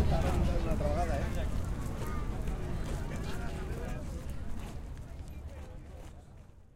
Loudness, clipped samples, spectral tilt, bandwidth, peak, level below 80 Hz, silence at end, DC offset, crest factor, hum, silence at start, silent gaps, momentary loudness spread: -37 LUFS; under 0.1%; -6.5 dB/octave; 16 kHz; -16 dBFS; -36 dBFS; 0.1 s; under 0.1%; 18 dB; none; 0 s; none; 16 LU